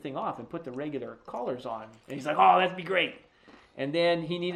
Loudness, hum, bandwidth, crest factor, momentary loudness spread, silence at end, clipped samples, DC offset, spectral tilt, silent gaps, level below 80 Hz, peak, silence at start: -28 LUFS; none; 10 kHz; 22 dB; 17 LU; 0 s; under 0.1%; under 0.1%; -6 dB/octave; none; -70 dBFS; -8 dBFS; 0.05 s